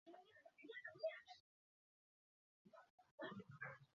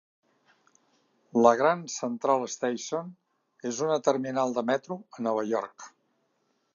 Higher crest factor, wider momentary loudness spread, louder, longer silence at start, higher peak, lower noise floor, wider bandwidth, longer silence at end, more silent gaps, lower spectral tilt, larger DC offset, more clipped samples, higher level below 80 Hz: about the same, 22 dB vs 24 dB; about the same, 18 LU vs 17 LU; second, -55 LUFS vs -28 LUFS; second, 0.05 s vs 1.35 s; second, -36 dBFS vs -4 dBFS; first, under -90 dBFS vs -74 dBFS; about the same, 7 kHz vs 7.6 kHz; second, 0.1 s vs 0.85 s; first, 1.40-2.65 s, 2.90-2.98 s, 3.11-3.18 s vs none; second, -3 dB/octave vs -4.5 dB/octave; neither; neither; second, under -90 dBFS vs -78 dBFS